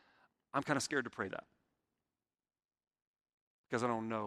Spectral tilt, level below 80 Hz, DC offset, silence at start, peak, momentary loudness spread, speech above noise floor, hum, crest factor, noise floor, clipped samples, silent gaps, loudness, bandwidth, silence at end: -4.5 dB/octave; -80 dBFS; under 0.1%; 0.55 s; -16 dBFS; 8 LU; over 52 dB; none; 26 dB; under -90 dBFS; under 0.1%; 3.07-3.14 s, 3.21-3.25 s, 3.34-3.64 s; -38 LUFS; 13 kHz; 0 s